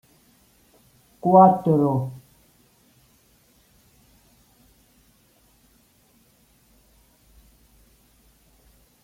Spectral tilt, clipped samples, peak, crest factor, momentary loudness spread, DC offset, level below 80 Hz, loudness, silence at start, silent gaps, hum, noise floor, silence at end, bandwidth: -10 dB/octave; under 0.1%; -2 dBFS; 24 dB; 19 LU; under 0.1%; -62 dBFS; -18 LUFS; 1.25 s; none; none; -60 dBFS; 6.9 s; 16 kHz